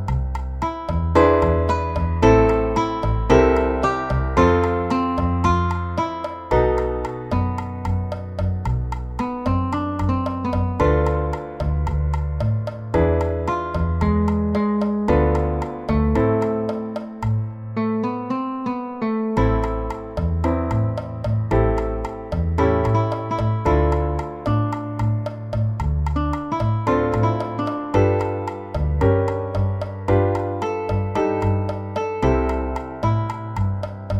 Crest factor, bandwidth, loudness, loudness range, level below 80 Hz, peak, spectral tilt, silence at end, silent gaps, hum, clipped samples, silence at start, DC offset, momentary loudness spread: 20 dB; 8.2 kHz; -21 LUFS; 5 LU; -28 dBFS; -2 dBFS; -8.5 dB/octave; 0 s; none; none; under 0.1%; 0 s; under 0.1%; 8 LU